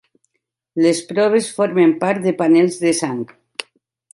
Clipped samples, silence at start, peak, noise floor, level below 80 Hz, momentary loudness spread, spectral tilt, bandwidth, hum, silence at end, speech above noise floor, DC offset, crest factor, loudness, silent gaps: under 0.1%; 0.75 s; -2 dBFS; -75 dBFS; -68 dBFS; 15 LU; -5 dB/octave; 11.5 kHz; none; 0.5 s; 59 dB; under 0.1%; 14 dB; -17 LUFS; none